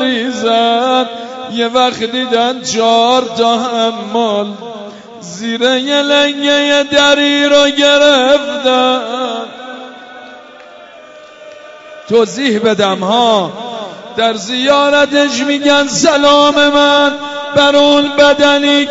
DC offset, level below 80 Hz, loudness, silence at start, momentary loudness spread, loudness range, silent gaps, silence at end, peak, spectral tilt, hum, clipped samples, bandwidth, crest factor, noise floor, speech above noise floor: under 0.1%; -52 dBFS; -10 LUFS; 0 s; 15 LU; 8 LU; none; 0 s; 0 dBFS; -3 dB/octave; none; under 0.1%; 8 kHz; 12 dB; -35 dBFS; 25 dB